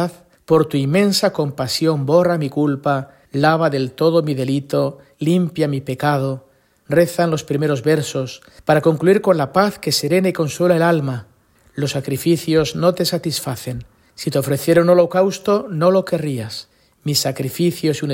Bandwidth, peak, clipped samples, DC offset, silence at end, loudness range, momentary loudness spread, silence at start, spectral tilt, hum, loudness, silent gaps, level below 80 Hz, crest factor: 16.5 kHz; -2 dBFS; under 0.1%; under 0.1%; 0 s; 3 LU; 11 LU; 0 s; -5.5 dB/octave; none; -18 LUFS; none; -54 dBFS; 16 dB